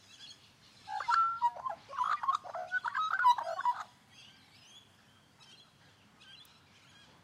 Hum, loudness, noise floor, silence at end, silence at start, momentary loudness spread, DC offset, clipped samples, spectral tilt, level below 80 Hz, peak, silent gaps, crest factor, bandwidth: none; -33 LUFS; -64 dBFS; 0.8 s; 0.2 s; 27 LU; under 0.1%; under 0.1%; -1.5 dB/octave; -80 dBFS; -16 dBFS; none; 20 dB; 14 kHz